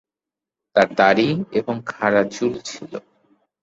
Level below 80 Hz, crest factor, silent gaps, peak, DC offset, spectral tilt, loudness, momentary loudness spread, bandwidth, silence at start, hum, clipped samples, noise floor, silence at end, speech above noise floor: -60 dBFS; 20 dB; none; -2 dBFS; under 0.1%; -5.5 dB/octave; -19 LUFS; 17 LU; 8 kHz; 0.75 s; none; under 0.1%; -88 dBFS; 0.65 s; 69 dB